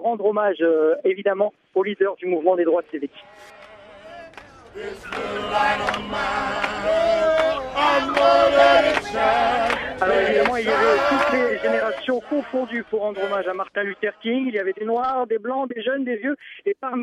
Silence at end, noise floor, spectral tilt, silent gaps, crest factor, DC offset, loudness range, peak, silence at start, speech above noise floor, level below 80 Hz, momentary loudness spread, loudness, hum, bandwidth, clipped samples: 0 s; -43 dBFS; -4.5 dB/octave; none; 18 dB; under 0.1%; 8 LU; -4 dBFS; 0 s; 22 dB; -52 dBFS; 10 LU; -21 LUFS; none; 12.5 kHz; under 0.1%